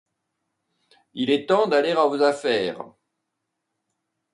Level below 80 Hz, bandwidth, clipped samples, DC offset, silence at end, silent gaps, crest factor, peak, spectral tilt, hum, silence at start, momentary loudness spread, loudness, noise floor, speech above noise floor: -74 dBFS; 11 kHz; under 0.1%; under 0.1%; 1.5 s; none; 18 dB; -6 dBFS; -5 dB/octave; none; 1.15 s; 19 LU; -21 LUFS; -80 dBFS; 59 dB